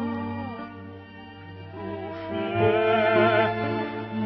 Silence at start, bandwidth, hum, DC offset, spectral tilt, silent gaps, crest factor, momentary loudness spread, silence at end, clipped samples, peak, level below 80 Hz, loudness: 0 s; 6 kHz; none; under 0.1%; -9 dB/octave; none; 18 dB; 22 LU; 0 s; under 0.1%; -8 dBFS; -60 dBFS; -25 LUFS